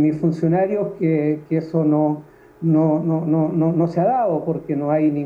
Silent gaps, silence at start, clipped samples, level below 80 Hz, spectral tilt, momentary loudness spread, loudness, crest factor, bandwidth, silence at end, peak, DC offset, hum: none; 0 s; under 0.1%; -60 dBFS; -11 dB/octave; 5 LU; -19 LUFS; 12 dB; 5 kHz; 0 s; -6 dBFS; under 0.1%; none